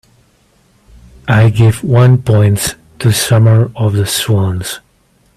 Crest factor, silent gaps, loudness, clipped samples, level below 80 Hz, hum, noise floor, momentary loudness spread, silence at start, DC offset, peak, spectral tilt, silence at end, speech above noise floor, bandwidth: 12 dB; none; -11 LUFS; under 0.1%; -40 dBFS; none; -53 dBFS; 11 LU; 1.25 s; under 0.1%; 0 dBFS; -5.5 dB/octave; 0.6 s; 43 dB; 14 kHz